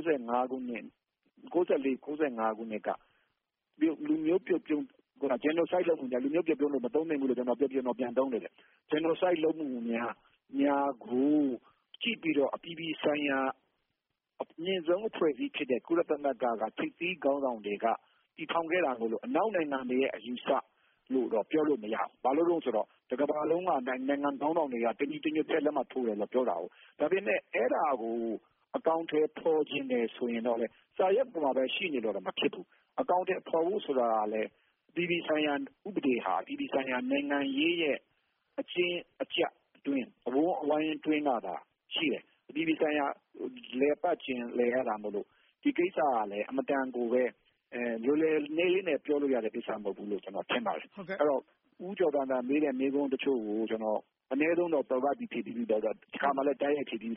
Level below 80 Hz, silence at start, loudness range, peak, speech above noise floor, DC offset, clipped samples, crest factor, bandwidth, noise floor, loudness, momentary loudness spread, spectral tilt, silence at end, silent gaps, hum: -78 dBFS; 0 s; 2 LU; -16 dBFS; 54 dB; under 0.1%; under 0.1%; 16 dB; 3.8 kHz; -85 dBFS; -32 LUFS; 9 LU; -3 dB/octave; 0 s; none; none